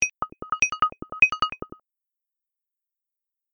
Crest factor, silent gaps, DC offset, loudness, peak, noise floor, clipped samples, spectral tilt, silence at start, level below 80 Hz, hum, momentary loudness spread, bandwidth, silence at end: 24 dB; none; under 0.1%; -22 LUFS; -4 dBFS; -87 dBFS; under 0.1%; -0.5 dB/octave; 0 s; -56 dBFS; none; 18 LU; 9.6 kHz; 1.9 s